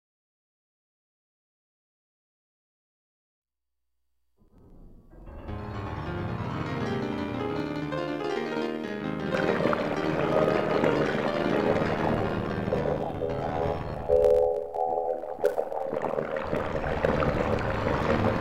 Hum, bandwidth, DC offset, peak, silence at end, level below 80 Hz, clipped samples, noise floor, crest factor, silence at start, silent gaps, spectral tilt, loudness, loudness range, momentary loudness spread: none; 15.5 kHz; 0.3%; -10 dBFS; 0 s; -46 dBFS; under 0.1%; -84 dBFS; 20 dB; 4.6 s; none; -7.5 dB/octave; -28 LUFS; 10 LU; 8 LU